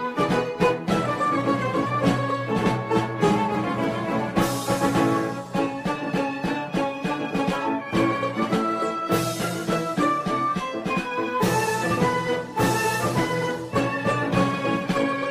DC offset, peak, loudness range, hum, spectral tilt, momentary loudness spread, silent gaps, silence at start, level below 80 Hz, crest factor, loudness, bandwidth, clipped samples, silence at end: under 0.1%; -6 dBFS; 2 LU; none; -5.5 dB/octave; 4 LU; none; 0 s; -52 dBFS; 18 dB; -24 LUFS; 16 kHz; under 0.1%; 0 s